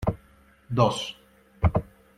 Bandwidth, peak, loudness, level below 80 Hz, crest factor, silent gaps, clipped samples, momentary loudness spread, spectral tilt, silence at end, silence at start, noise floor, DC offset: 13 kHz; -6 dBFS; -27 LUFS; -40 dBFS; 22 dB; none; under 0.1%; 12 LU; -6.5 dB/octave; 0.35 s; 0 s; -57 dBFS; under 0.1%